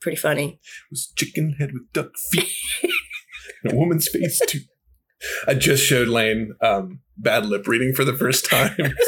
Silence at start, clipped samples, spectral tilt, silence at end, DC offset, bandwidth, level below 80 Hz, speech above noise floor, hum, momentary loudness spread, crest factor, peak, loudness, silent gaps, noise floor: 0 s; under 0.1%; -4 dB/octave; 0 s; under 0.1%; 19 kHz; -50 dBFS; 40 dB; none; 13 LU; 18 dB; -4 dBFS; -21 LUFS; none; -62 dBFS